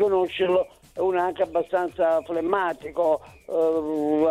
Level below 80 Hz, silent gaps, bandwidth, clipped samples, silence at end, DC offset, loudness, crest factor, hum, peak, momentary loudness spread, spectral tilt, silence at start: -58 dBFS; none; 13.5 kHz; under 0.1%; 0 s; under 0.1%; -24 LUFS; 16 dB; none; -8 dBFS; 5 LU; -6 dB/octave; 0 s